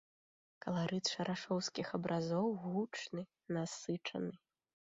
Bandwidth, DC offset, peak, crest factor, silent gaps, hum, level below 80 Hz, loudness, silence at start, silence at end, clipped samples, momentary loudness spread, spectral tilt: 7.6 kHz; under 0.1%; -24 dBFS; 16 dB; none; none; -78 dBFS; -40 LUFS; 0.65 s; 0.6 s; under 0.1%; 8 LU; -5 dB/octave